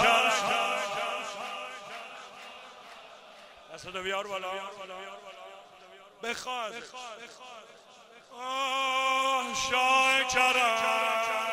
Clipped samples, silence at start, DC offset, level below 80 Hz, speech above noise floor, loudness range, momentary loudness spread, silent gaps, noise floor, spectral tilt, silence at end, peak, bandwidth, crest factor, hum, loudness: under 0.1%; 0 s; under 0.1%; -66 dBFS; 24 dB; 14 LU; 24 LU; none; -54 dBFS; -0.5 dB/octave; 0 s; -10 dBFS; 16 kHz; 20 dB; none; -28 LUFS